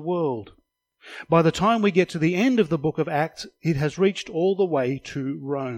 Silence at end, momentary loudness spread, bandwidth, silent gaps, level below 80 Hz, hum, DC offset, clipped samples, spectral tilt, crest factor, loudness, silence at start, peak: 0 s; 10 LU; 14 kHz; none; -56 dBFS; none; under 0.1%; under 0.1%; -6.5 dB/octave; 18 dB; -23 LUFS; 0 s; -6 dBFS